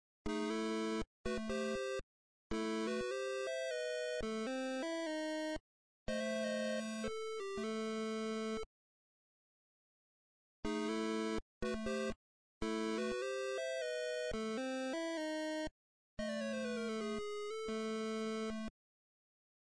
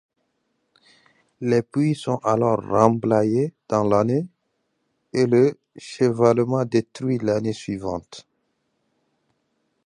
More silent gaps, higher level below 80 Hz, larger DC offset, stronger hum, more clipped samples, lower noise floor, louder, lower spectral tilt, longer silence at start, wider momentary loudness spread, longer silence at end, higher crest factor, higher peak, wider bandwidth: first, 1.07-1.24 s, 2.03-2.50 s, 5.60-6.06 s, 8.66-10.63 s, 11.42-11.61 s, 12.16-12.61 s, 15.71-16.17 s vs none; about the same, -60 dBFS vs -58 dBFS; neither; neither; neither; first, under -90 dBFS vs -73 dBFS; second, -41 LUFS vs -21 LUFS; second, -4 dB/octave vs -7.5 dB/octave; second, 0.25 s vs 1.4 s; second, 5 LU vs 11 LU; second, 1.05 s vs 1.65 s; second, 14 dB vs 22 dB; second, -28 dBFS vs -2 dBFS; about the same, 11 kHz vs 11 kHz